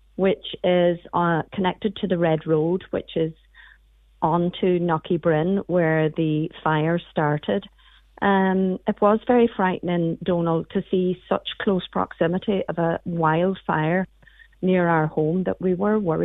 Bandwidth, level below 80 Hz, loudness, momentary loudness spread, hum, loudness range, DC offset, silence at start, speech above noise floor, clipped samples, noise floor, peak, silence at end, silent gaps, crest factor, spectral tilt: 4 kHz; -54 dBFS; -22 LUFS; 6 LU; none; 2 LU; under 0.1%; 0.2 s; 33 dB; under 0.1%; -55 dBFS; -6 dBFS; 0 s; none; 16 dB; -10 dB/octave